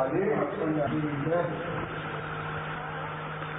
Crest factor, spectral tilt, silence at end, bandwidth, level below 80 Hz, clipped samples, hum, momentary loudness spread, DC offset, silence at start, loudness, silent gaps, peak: 16 dB; -10 dB/octave; 0 s; 3.9 kHz; -56 dBFS; under 0.1%; none; 7 LU; under 0.1%; 0 s; -31 LUFS; none; -14 dBFS